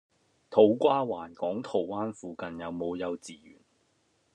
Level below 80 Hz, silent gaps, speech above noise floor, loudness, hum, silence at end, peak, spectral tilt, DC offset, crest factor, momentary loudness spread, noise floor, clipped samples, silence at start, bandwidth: -72 dBFS; none; 42 dB; -29 LUFS; none; 1 s; -8 dBFS; -6.5 dB/octave; under 0.1%; 22 dB; 16 LU; -71 dBFS; under 0.1%; 0.5 s; 10.5 kHz